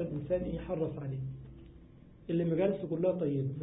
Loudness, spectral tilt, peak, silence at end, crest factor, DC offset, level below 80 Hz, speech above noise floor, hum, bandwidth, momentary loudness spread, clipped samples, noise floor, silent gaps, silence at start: -34 LUFS; -8.5 dB/octave; -18 dBFS; 0 s; 16 dB; under 0.1%; -54 dBFS; 22 dB; none; 3.9 kHz; 18 LU; under 0.1%; -55 dBFS; none; 0 s